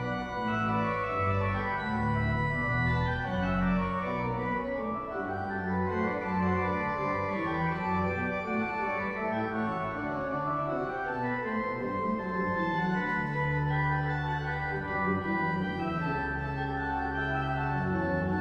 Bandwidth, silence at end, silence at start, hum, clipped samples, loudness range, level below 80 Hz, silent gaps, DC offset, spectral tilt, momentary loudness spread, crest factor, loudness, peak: 8.2 kHz; 0 s; 0 s; none; under 0.1%; 2 LU; -46 dBFS; none; under 0.1%; -8.5 dB/octave; 4 LU; 14 dB; -31 LUFS; -16 dBFS